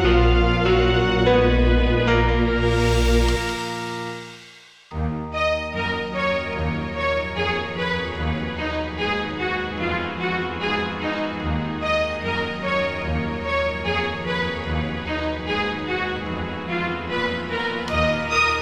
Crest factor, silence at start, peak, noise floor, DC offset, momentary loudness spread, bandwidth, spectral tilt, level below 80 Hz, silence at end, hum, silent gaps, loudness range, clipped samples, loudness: 16 dB; 0 s; -6 dBFS; -47 dBFS; 0.4%; 8 LU; 13.5 kHz; -6 dB/octave; -28 dBFS; 0 s; none; none; 6 LU; under 0.1%; -22 LUFS